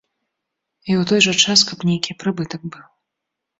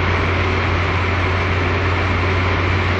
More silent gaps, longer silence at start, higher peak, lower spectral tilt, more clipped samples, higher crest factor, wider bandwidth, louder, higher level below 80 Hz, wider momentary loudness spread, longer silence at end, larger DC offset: neither; first, 0.85 s vs 0 s; first, -2 dBFS vs -6 dBFS; second, -3 dB/octave vs -6.5 dB/octave; neither; first, 20 dB vs 12 dB; about the same, 8 kHz vs 7.6 kHz; about the same, -16 LUFS vs -18 LUFS; second, -60 dBFS vs -30 dBFS; first, 18 LU vs 1 LU; first, 0.8 s vs 0 s; neither